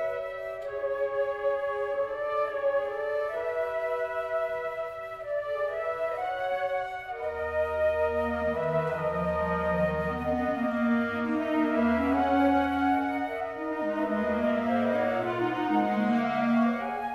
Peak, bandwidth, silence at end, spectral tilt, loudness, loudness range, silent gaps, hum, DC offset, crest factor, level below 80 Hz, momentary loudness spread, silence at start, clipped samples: -14 dBFS; 12.5 kHz; 0 s; -7.5 dB/octave; -29 LUFS; 5 LU; none; none; under 0.1%; 14 dB; -52 dBFS; 7 LU; 0 s; under 0.1%